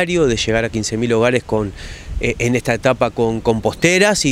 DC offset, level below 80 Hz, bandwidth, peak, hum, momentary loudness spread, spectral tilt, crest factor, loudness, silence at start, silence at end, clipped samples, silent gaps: under 0.1%; -34 dBFS; 16 kHz; 0 dBFS; none; 9 LU; -4.5 dB/octave; 16 dB; -17 LUFS; 0 s; 0 s; under 0.1%; none